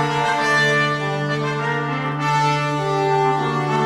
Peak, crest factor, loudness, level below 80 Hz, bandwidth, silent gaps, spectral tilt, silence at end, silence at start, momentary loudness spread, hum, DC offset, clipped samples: -6 dBFS; 14 dB; -19 LUFS; -56 dBFS; 12.5 kHz; none; -5 dB/octave; 0 s; 0 s; 6 LU; none; under 0.1%; under 0.1%